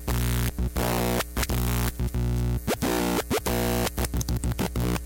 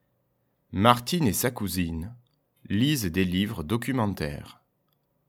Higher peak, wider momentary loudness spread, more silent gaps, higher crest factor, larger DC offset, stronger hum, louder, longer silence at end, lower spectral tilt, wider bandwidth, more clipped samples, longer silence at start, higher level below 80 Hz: second, -14 dBFS vs -2 dBFS; second, 3 LU vs 13 LU; neither; second, 12 dB vs 26 dB; neither; first, 60 Hz at -30 dBFS vs none; about the same, -27 LUFS vs -26 LUFS; second, 0 s vs 0.75 s; about the same, -5 dB/octave vs -5 dB/octave; about the same, 17 kHz vs 18.5 kHz; neither; second, 0 s vs 0.7 s; first, -30 dBFS vs -50 dBFS